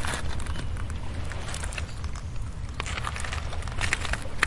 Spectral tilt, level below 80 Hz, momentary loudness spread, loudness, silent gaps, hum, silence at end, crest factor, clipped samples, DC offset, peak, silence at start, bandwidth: -3.5 dB/octave; -36 dBFS; 8 LU; -33 LUFS; none; none; 0 s; 26 dB; under 0.1%; 0.2%; -4 dBFS; 0 s; 11.5 kHz